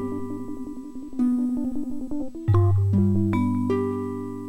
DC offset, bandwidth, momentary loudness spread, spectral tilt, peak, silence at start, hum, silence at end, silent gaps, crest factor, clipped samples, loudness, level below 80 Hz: under 0.1%; 8.4 kHz; 14 LU; -10 dB/octave; -8 dBFS; 0 s; none; 0 s; none; 14 dB; under 0.1%; -25 LUFS; -48 dBFS